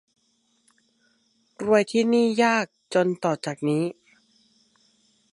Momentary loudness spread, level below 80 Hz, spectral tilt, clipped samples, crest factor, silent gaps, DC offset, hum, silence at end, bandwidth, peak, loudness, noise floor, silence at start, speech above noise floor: 7 LU; -72 dBFS; -5.5 dB/octave; under 0.1%; 20 dB; none; under 0.1%; none; 1.4 s; 11.5 kHz; -6 dBFS; -23 LUFS; -68 dBFS; 1.6 s; 46 dB